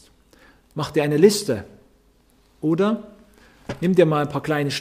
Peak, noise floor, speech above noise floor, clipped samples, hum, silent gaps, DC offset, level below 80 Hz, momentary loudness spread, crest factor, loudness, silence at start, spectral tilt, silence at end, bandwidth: -2 dBFS; -58 dBFS; 38 dB; under 0.1%; none; none; under 0.1%; -56 dBFS; 14 LU; 20 dB; -21 LUFS; 0.75 s; -5.5 dB/octave; 0 s; 15.5 kHz